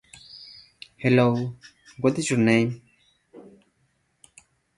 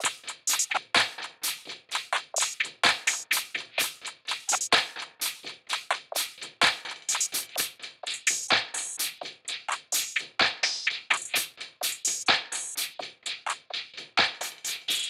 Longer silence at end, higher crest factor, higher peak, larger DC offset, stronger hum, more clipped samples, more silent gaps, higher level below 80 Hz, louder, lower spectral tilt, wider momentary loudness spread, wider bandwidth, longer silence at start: first, 1.35 s vs 0 s; about the same, 22 dB vs 22 dB; first, -4 dBFS vs -8 dBFS; neither; neither; neither; neither; first, -62 dBFS vs -74 dBFS; first, -23 LUFS vs -28 LUFS; first, -6 dB/octave vs 1.5 dB/octave; first, 25 LU vs 10 LU; second, 11.5 kHz vs 17.5 kHz; first, 0.35 s vs 0 s